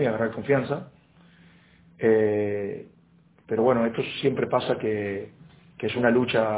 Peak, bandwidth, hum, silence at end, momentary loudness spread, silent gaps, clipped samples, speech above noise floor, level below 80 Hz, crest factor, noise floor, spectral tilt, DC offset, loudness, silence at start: -6 dBFS; 4 kHz; none; 0 s; 12 LU; none; under 0.1%; 34 dB; -60 dBFS; 20 dB; -58 dBFS; -10.5 dB/octave; under 0.1%; -25 LUFS; 0 s